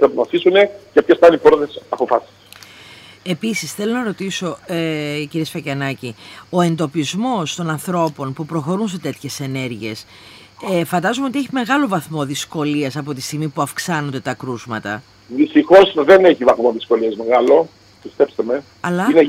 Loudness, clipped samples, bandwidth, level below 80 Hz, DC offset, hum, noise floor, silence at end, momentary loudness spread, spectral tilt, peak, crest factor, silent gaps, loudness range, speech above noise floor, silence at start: -17 LUFS; under 0.1%; 16 kHz; -56 dBFS; under 0.1%; none; -41 dBFS; 0 s; 15 LU; -5.5 dB/octave; 0 dBFS; 16 dB; none; 9 LU; 25 dB; 0 s